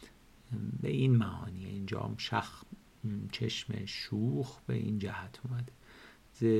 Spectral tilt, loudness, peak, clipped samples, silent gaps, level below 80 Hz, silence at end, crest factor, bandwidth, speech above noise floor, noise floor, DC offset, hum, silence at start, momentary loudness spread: -7 dB/octave; -36 LUFS; -16 dBFS; under 0.1%; none; -62 dBFS; 0 s; 18 dB; 13 kHz; 23 dB; -57 dBFS; under 0.1%; none; 0 s; 17 LU